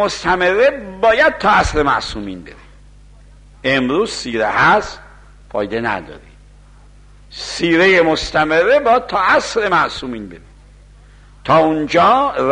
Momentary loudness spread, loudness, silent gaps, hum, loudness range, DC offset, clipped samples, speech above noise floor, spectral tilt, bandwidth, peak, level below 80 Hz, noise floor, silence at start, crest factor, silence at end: 16 LU; -14 LUFS; none; 50 Hz at -45 dBFS; 5 LU; under 0.1%; under 0.1%; 28 dB; -4.5 dB/octave; 10.5 kHz; -2 dBFS; -38 dBFS; -43 dBFS; 0 s; 14 dB; 0 s